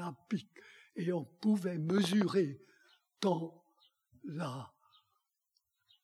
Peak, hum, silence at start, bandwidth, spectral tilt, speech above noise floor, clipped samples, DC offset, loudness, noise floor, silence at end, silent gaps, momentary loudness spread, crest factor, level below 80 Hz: -18 dBFS; none; 0 s; 13.5 kHz; -6.5 dB/octave; 49 dB; under 0.1%; under 0.1%; -35 LUFS; -82 dBFS; 1.35 s; none; 19 LU; 20 dB; -86 dBFS